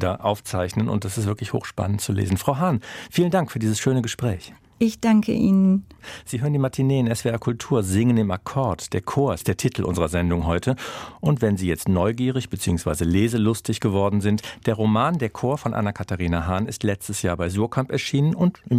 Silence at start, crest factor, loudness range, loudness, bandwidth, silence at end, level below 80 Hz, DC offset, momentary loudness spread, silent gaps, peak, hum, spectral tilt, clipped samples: 0 s; 18 dB; 2 LU; -23 LUFS; 15.5 kHz; 0 s; -48 dBFS; under 0.1%; 7 LU; none; -4 dBFS; none; -6.5 dB/octave; under 0.1%